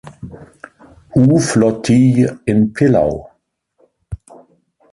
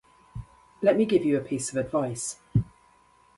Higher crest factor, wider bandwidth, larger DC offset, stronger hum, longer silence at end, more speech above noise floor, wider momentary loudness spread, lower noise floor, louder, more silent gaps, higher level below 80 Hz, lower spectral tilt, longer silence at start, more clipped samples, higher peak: second, 14 dB vs 20 dB; about the same, 11.5 kHz vs 11.5 kHz; neither; neither; about the same, 0.8 s vs 0.75 s; first, 49 dB vs 35 dB; about the same, 21 LU vs 21 LU; about the same, -62 dBFS vs -60 dBFS; first, -14 LUFS vs -26 LUFS; neither; first, -42 dBFS vs -52 dBFS; about the same, -7 dB/octave vs -6 dB/octave; second, 0.05 s vs 0.35 s; neither; first, -2 dBFS vs -8 dBFS